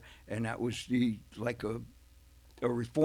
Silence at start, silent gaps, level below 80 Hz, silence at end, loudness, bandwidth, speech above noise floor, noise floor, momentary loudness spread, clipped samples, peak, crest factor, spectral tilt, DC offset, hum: 0 s; none; -58 dBFS; 0 s; -35 LUFS; 14 kHz; 26 dB; -59 dBFS; 10 LU; under 0.1%; -16 dBFS; 18 dB; -6.5 dB/octave; under 0.1%; none